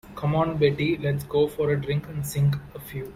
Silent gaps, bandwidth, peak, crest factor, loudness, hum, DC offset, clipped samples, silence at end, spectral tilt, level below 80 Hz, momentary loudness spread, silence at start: none; 16 kHz; -8 dBFS; 16 dB; -25 LUFS; none; under 0.1%; under 0.1%; 0 s; -7 dB/octave; -48 dBFS; 9 LU; 0.05 s